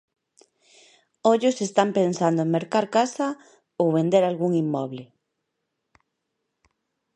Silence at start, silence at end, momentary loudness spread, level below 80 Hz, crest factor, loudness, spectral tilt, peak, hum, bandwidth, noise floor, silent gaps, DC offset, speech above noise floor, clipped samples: 1.25 s; 2.1 s; 9 LU; -76 dBFS; 22 dB; -23 LUFS; -6 dB/octave; -4 dBFS; none; 10.5 kHz; -79 dBFS; none; under 0.1%; 57 dB; under 0.1%